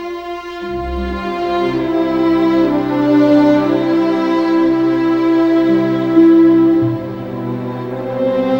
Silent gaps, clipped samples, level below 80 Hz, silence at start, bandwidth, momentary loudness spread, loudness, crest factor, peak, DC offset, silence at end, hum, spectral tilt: none; under 0.1%; -38 dBFS; 0 s; 6.2 kHz; 13 LU; -14 LUFS; 14 dB; 0 dBFS; under 0.1%; 0 s; none; -8 dB/octave